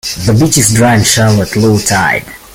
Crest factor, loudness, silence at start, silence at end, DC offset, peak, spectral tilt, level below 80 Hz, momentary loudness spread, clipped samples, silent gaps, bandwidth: 10 dB; -9 LUFS; 0.05 s; 0.15 s; under 0.1%; 0 dBFS; -4 dB/octave; -34 dBFS; 4 LU; under 0.1%; none; 17 kHz